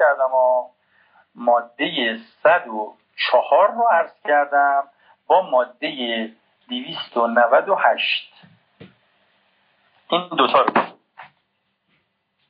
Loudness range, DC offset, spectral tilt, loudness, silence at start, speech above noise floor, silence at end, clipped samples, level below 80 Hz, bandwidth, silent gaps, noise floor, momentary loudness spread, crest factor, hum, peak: 5 LU; under 0.1%; 0 dB/octave; -19 LUFS; 0 s; 52 dB; 1.25 s; under 0.1%; -84 dBFS; 5.2 kHz; none; -71 dBFS; 13 LU; 18 dB; none; -2 dBFS